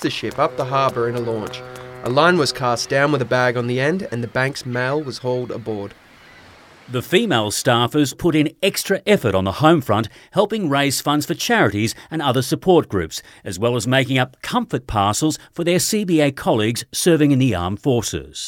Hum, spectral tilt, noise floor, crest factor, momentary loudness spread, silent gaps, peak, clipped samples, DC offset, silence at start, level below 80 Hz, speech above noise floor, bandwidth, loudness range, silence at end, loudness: none; -4.5 dB/octave; -45 dBFS; 18 dB; 9 LU; none; 0 dBFS; under 0.1%; under 0.1%; 0 s; -48 dBFS; 27 dB; 17.5 kHz; 4 LU; 0 s; -19 LUFS